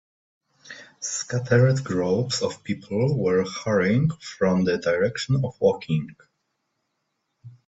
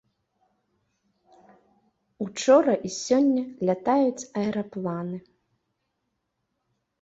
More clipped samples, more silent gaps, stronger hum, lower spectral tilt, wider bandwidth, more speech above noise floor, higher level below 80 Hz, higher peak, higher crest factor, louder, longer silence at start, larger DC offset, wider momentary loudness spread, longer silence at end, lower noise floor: neither; neither; neither; about the same, -6 dB/octave vs -5.5 dB/octave; about the same, 8 kHz vs 8 kHz; about the same, 54 dB vs 55 dB; first, -58 dBFS vs -68 dBFS; about the same, -6 dBFS vs -6 dBFS; about the same, 18 dB vs 20 dB; about the same, -23 LUFS vs -24 LUFS; second, 0.65 s vs 2.2 s; neither; second, 10 LU vs 15 LU; second, 0.15 s vs 1.85 s; about the same, -76 dBFS vs -78 dBFS